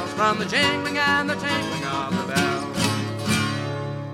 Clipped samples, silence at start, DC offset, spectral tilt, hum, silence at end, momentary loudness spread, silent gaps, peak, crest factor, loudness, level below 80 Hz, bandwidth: under 0.1%; 0 s; under 0.1%; -4 dB/octave; none; 0 s; 6 LU; none; -6 dBFS; 16 dB; -23 LUFS; -54 dBFS; 16.5 kHz